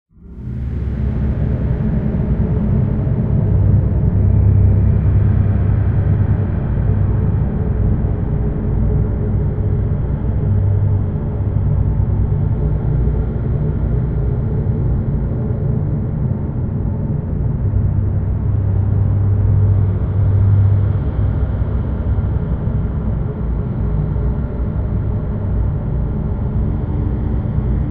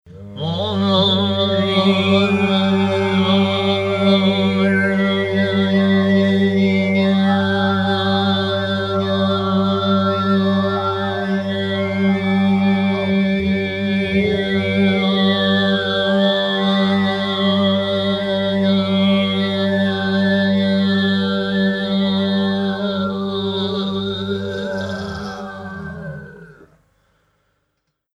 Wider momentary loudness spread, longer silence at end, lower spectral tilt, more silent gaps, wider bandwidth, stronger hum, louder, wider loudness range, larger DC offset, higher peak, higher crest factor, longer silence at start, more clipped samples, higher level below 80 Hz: about the same, 6 LU vs 7 LU; second, 0 s vs 1.7 s; first, -13.5 dB/octave vs -7 dB/octave; neither; second, 3.1 kHz vs 7.4 kHz; neither; about the same, -18 LUFS vs -17 LUFS; about the same, 5 LU vs 7 LU; neither; about the same, -2 dBFS vs -4 dBFS; about the same, 12 dB vs 14 dB; first, 0.2 s vs 0.05 s; neither; first, -22 dBFS vs -50 dBFS